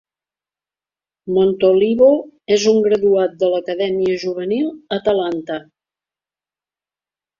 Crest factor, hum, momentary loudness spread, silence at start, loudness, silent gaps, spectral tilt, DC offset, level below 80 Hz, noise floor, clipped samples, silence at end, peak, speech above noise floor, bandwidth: 16 dB; none; 9 LU; 1.25 s; -17 LUFS; none; -5.5 dB/octave; under 0.1%; -58 dBFS; under -90 dBFS; under 0.1%; 1.8 s; -2 dBFS; over 74 dB; 7.4 kHz